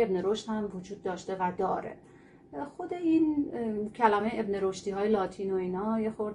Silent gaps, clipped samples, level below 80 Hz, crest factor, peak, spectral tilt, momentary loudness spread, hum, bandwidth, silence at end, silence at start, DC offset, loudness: none; under 0.1%; -62 dBFS; 20 dB; -10 dBFS; -6.5 dB/octave; 12 LU; none; 10.5 kHz; 0 s; 0 s; under 0.1%; -31 LUFS